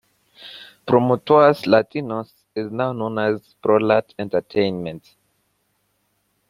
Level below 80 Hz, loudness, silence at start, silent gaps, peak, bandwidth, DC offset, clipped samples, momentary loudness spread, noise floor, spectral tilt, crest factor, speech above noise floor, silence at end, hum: -62 dBFS; -20 LUFS; 0.4 s; none; -2 dBFS; 14.5 kHz; under 0.1%; under 0.1%; 19 LU; -68 dBFS; -7.5 dB/octave; 20 dB; 49 dB; 1.5 s; 50 Hz at -55 dBFS